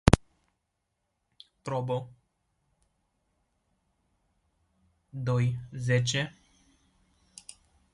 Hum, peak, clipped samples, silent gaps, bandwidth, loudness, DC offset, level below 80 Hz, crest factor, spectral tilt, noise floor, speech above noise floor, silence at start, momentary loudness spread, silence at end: none; 0 dBFS; under 0.1%; none; 11.5 kHz; -30 LUFS; under 0.1%; -44 dBFS; 32 dB; -5.5 dB/octave; -81 dBFS; 52 dB; 0.05 s; 22 LU; 1.65 s